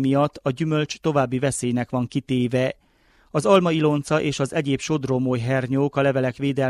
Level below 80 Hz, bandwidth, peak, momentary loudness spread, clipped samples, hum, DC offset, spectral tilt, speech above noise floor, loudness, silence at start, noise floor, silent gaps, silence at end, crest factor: -56 dBFS; 12.5 kHz; -4 dBFS; 6 LU; under 0.1%; none; under 0.1%; -6 dB/octave; 37 dB; -22 LUFS; 0 s; -58 dBFS; none; 0 s; 18 dB